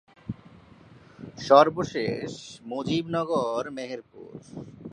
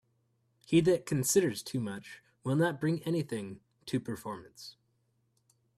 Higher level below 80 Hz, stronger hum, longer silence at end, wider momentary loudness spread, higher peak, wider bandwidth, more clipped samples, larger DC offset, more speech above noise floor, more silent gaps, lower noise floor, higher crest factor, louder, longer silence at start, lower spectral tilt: first, -60 dBFS vs -68 dBFS; neither; second, 0 s vs 1.05 s; first, 25 LU vs 20 LU; first, -4 dBFS vs -14 dBFS; second, 10.5 kHz vs 15 kHz; neither; neither; second, 26 dB vs 44 dB; neither; second, -52 dBFS vs -75 dBFS; about the same, 24 dB vs 20 dB; first, -25 LUFS vs -31 LUFS; second, 0.25 s vs 0.7 s; about the same, -5.5 dB/octave vs -5 dB/octave